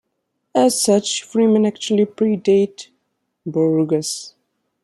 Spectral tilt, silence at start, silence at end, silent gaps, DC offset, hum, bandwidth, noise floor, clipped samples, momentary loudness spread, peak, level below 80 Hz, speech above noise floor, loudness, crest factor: -5 dB/octave; 0.55 s; 0.55 s; none; under 0.1%; none; 13.5 kHz; -73 dBFS; under 0.1%; 11 LU; -2 dBFS; -68 dBFS; 56 dB; -18 LUFS; 16 dB